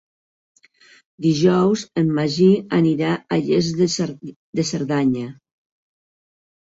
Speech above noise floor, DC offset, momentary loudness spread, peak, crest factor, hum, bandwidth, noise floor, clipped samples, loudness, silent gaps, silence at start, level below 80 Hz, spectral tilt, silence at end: 34 dB; under 0.1%; 10 LU; -4 dBFS; 16 dB; none; 7.8 kHz; -52 dBFS; under 0.1%; -19 LUFS; 4.36-4.53 s; 1.2 s; -58 dBFS; -6 dB/octave; 1.3 s